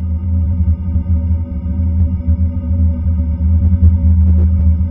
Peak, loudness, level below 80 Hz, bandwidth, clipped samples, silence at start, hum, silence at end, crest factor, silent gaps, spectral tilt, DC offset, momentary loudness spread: 0 dBFS; -15 LUFS; -16 dBFS; 2.2 kHz; under 0.1%; 0 s; none; 0 s; 12 dB; none; -13.5 dB/octave; under 0.1%; 6 LU